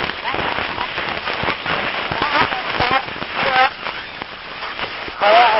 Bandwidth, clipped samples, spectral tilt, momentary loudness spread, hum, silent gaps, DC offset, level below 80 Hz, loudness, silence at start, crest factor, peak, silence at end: 5.8 kHz; under 0.1%; -7 dB/octave; 12 LU; none; none; under 0.1%; -44 dBFS; -19 LUFS; 0 s; 20 dB; 0 dBFS; 0 s